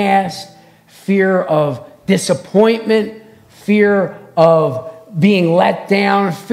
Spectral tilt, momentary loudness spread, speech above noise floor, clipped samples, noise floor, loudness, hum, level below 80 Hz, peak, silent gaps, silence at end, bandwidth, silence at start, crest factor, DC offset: -6 dB/octave; 15 LU; 31 dB; under 0.1%; -44 dBFS; -14 LUFS; none; -62 dBFS; 0 dBFS; none; 0 s; 14.5 kHz; 0 s; 14 dB; under 0.1%